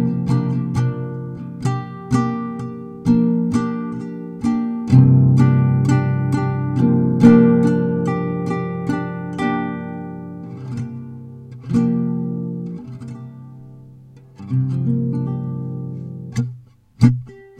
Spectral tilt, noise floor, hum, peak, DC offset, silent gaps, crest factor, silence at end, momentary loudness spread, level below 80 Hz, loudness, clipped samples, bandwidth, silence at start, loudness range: -9 dB/octave; -43 dBFS; none; 0 dBFS; under 0.1%; none; 18 dB; 0.15 s; 19 LU; -48 dBFS; -19 LUFS; under 0.1%; 8.8 kHz; 0 s; 10 LU